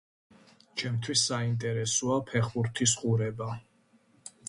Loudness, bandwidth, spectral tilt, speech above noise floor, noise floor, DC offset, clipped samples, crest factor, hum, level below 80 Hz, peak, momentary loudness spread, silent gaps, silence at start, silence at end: -29 LUFS; 11.5 kHz; -4 dB/octave; 36 dB; -65 dBFS; under 0.1%; under 0.1%; 20 dB; none; -64 dBFS; -12 dBFS; 12 LU; none; 0.75 s; 0 s